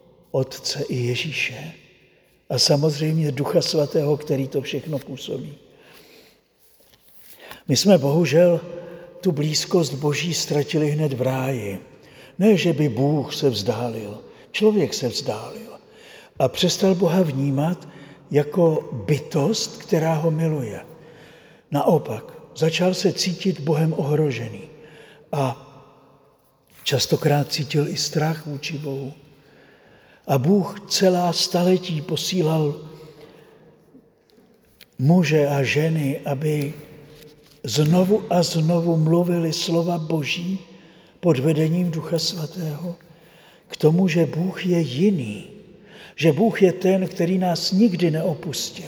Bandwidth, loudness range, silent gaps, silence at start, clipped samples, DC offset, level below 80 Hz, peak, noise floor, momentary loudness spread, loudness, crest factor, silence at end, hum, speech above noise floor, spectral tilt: over 20 kHz; 4 LU; none; 0.35 s; under 0.1%; under 0.1%; -62 dBFS; -2 dBFS; -58 dBFS; 14 LU; -21 LUFS; 20 dB; 0 s; none; 38 dB; -5.5 dB/octave